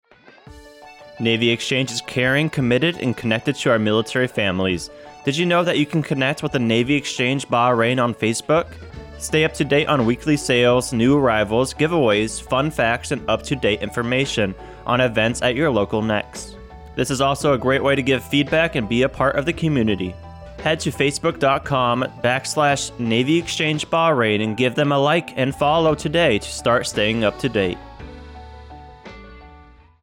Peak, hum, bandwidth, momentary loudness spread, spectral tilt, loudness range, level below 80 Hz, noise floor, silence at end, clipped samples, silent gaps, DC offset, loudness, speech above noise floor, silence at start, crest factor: -6 dBFS; none; 17 kHz; 8 LU; -5 dB/octave; 2 LU; -44 dBFS; -47 dBFS; 0.4 s; under 0.1%; none; under 0.1%; -19 LUFS; 27 dB; 0.5 s; 14 dB